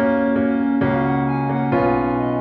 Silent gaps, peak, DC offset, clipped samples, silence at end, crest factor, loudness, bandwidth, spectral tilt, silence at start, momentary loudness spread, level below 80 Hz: none; -6 dBFS; under 0.1%; under 0.1%; 0 s; 12 dB; -19 LUFS; 4.6 kHz; -11 dB/octave; 0 s; 2 LU; -42 dBFS